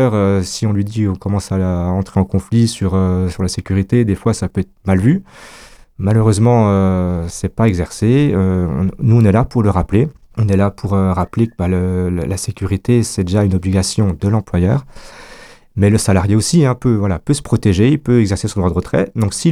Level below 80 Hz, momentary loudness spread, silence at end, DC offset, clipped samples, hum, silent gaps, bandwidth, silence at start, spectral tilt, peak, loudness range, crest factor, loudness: -34 dBFS; 7 LU; 0 s; under 0.1%; under 0.1%; none; none; 13.5 kHz; 0 s; -7 dB/octave; -2 dBFS; 3 LU; 14 dB; -15 LUFS